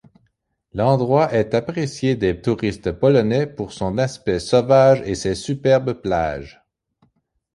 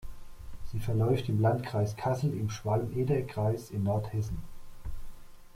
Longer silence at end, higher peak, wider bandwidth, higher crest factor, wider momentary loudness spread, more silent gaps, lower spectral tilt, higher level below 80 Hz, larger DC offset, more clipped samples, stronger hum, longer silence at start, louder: first, 1.05 s vs 0.05 s; first, -2 dBFS vs -14 dBFS; second, 11.5 kHz vs 15.5 kHz; about the same, 18 dB vs 18 dB; second, 9 LU vs 18 LU; neither; about the same, -6.5 dB/octave vs -7.5 dB/octave; about the same, -44 dBFS vs -46 dBFS; neither; neither; neither; first, 0.75 s vs 0 s; first, -19 LUFS vs -31 LUFS